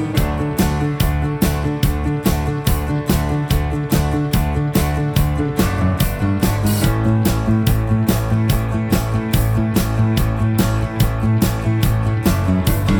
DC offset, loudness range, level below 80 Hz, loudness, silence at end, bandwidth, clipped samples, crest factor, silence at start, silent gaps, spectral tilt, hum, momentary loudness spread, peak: under 0.1%; 2 LU; -24 dBFS; -18 LUFS; 0 s; over 20 kHz; under 0.1%; 14 dB; 0 s; none; -6.5 dB/octave; none; 2 LU; -2 dBFS